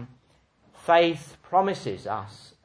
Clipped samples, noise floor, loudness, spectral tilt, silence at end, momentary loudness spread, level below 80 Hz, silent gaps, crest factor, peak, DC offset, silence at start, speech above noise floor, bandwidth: under 0.1%; -63 dBFS; -25 LUFS; -5.5 dB/octave; 0.3 s; 16 LU; -66 dBFS; none; 20 dB; -6 dBFS; under 0.1%; 0 s; 38 dB; 11 kHz